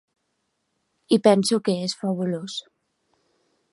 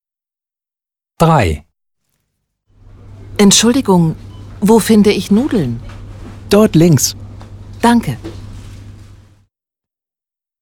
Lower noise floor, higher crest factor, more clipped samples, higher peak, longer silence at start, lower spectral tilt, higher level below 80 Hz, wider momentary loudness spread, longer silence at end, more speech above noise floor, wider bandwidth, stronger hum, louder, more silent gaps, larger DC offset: second, -75 dBFS vs -89 dBFS; first, 22 dB vs 14 dB; neither; second, -4 dBFS vs 0 dBFS; about the same, 1.1 s vs 1.2 s; about the same, -5.5 dB/octave vs -5 dB/octave; second, -74 dBFS vs -36 dBFS; second, 14 LU vs 24 LU; second, 1.15 s vs 1.6 s; second, 53 dB vs 79 dB; second, 11.5 kHz vs 19 kHz; neither; second, -22 LUFS vs -12 LUFS; neither; neither